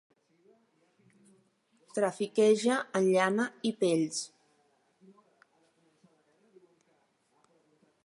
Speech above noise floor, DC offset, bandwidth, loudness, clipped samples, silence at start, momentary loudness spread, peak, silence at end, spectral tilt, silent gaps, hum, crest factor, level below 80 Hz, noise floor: 44 dB; under 0.1%; 11.5 kHz; -29 LUFS; under 0.1%; 1.95 s; 10 LU; -12 dBFS; 3.8 s; -4.5 dB/octave; none; none; 22 dB; -86 dBFS; -72 dBFS